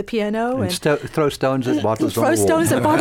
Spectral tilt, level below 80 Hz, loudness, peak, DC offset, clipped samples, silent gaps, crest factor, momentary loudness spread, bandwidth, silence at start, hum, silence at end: -5 dB/octave; -50 dBFS; -19 LUFS; -6 dBFS; under 0.1%; under 0.1%; none; 12 dB; 5 LU; 17 kHz; 0 s; none; 0 s